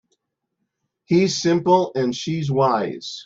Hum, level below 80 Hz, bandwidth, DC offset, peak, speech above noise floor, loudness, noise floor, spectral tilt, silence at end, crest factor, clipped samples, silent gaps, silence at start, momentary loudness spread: none; -62 dBFS; 7.8 kHz; under 0.1%; -4 dBFS; 57 dB; -20 LUFS; -77 dBFS; -5.5 dB/octave; 0.05 s; 18 dB; under 0.1%; none; 1.1 s; 6 LU